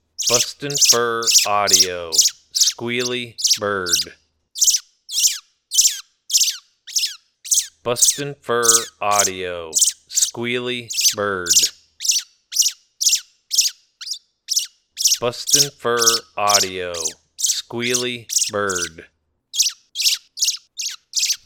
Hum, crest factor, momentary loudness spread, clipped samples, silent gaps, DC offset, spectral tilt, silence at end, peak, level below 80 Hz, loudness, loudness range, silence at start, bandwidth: none; 20 dB; 11 LU; under 0.1%; none; under 0.1%; 0 dB/octave; 0.1 s; 0 dBFS; -60 dBFS; -17 LUFS; 4 LU; 0.2 s; 19 kHz